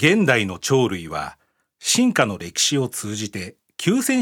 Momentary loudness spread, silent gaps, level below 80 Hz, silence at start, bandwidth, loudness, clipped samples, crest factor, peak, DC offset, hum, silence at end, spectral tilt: 13 LU; none; -58 dBFS; 0 s; 18 kHz; -20 LUFS; under 0.1%; 20 dB; -2 dBFS; under 0.1%; none; 0 s; -3.5 dB/octave